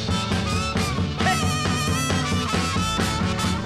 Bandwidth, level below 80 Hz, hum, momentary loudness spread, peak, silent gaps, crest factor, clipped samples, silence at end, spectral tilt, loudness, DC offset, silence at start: 15 kHz; -36 dBFS; none; 2 LU; -8 dBFS; none; 14 dB; under 0.1%; 0 s; -4.5 dB/octave; -23 LUFS; under 0.1%; 0 s